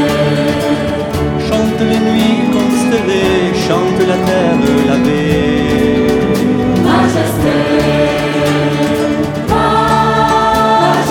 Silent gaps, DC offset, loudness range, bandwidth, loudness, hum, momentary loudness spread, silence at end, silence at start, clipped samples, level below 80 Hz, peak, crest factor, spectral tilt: none; under 0.1%; 1 LU; 19 kHz; -12 LUFS; none; 4 LU; 0 s; 0 s; under 0.1%; -32 dBFS; 0 dBFS; 10 dB; -6 dB/octave